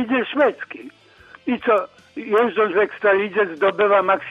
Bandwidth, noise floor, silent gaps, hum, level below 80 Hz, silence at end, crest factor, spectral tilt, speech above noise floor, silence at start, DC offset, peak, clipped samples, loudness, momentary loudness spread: 5.6 kHz; -48 dBFS; none; none; -64 dBFS; 0 s; 16 dB; -6.5 dB/octave; 29 dB; 0 s; under 0.1%; -4 dBFS; under 0.1%; -19 LUFS; 17 LU